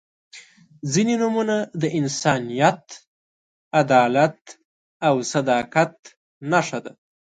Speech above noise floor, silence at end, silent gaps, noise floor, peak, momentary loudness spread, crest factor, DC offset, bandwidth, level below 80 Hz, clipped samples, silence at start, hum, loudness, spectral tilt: 27 dB; 0.5 s; 3.07-3.71 s, 4.65-5.00 s, 5.99-6.03 s, 6.17-6.41 s; -47 dBFS; -2 dBFS; 11 LU; 20 dB; under 0.1%; 9.4 kHz; -66 dBFS; under 0.1%; 0.35 s; none; -21 LUFS; -5 dB/octave